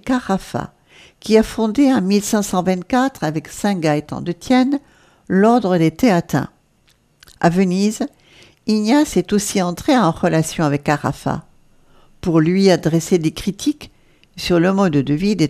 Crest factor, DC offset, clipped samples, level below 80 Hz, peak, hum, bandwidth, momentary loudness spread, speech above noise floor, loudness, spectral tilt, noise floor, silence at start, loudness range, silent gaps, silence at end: 16 dB; under 0.1%; under 0.1%; -46 dBFS; 0 dBFS; none; 15.5 kHz; 12 LU; 41 dB; -17 LUFS; -6 dB/octave; -57 dBFS; 0.05 s; 2 LU; none; 0 s